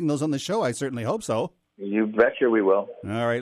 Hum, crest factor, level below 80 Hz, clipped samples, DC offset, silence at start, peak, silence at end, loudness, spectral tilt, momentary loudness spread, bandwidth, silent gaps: none; 18 dB; -64 dBFS; under 0.1%; under 0.1%; 0 s; -6 dBFS; 0 s; -24 LUFS; -5.5 dB/octave; 8 LU; 14 kHz; none